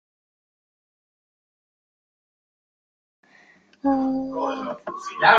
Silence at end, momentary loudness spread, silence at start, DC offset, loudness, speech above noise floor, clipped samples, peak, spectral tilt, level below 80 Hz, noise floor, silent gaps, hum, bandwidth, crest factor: 0 s; 11 LU; 3.85 s; under 0.1%; -25 LUFS; 34 dB; under 0.1%; -2 dBFS; -4.5 dB/octave; -62 dBFS; -55 dBFS; none; none; 7.6 kHz; 24 dB